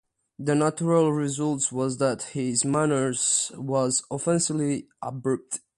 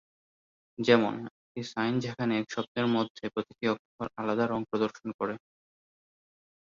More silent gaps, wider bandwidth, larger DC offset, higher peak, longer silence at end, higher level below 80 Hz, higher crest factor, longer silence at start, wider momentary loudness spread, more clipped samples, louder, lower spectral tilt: second, none vs 1.31-1.55 s, 2.68-2.75 s, 3.10-3.15 s, 3.79-3.98 s, 5.14-5.19 s; first, 11.5 kHz vs 7.4 kHz; neither; about the same, -8 dBFS vs -8 dBFS; second, 0.2 s vs 1.4 s; about the same, -66 dBFS vs -70 dBFS; second, 16 dB vs 24 dB; second, 0.4 s vs 0.8 s; second, 7 LU vs 15 LU; neither; first, -25 LUFS vs -31 LUFS; second, -4.5 dB/octave vs -6 dB/octave